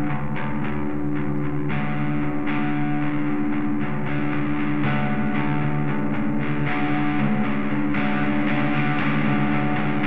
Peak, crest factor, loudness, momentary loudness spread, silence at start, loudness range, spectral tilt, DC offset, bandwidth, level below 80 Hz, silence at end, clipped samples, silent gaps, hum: -8 dBFS; 14 dB; -24 LUFS; 4 LU; 0 s; 2 LU; -9.5 dB/octave; 6%; 4.8 kHz; -44 dBFS; 0 s; under 0.1%; none; none